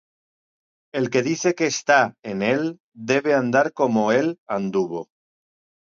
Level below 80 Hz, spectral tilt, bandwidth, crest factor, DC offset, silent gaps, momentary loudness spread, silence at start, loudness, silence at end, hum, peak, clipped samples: -68 dBFS; -4.5 dB/octave; 7.6 kHz; 20 dB; under 0.1%; 2.19-2.23 s, 2.80-2.92 s, 4.38-4.46 s; 10 LU; 0.95 s; -21 LUFS; 0.85 s; none; -2 dBFS; under 0.1%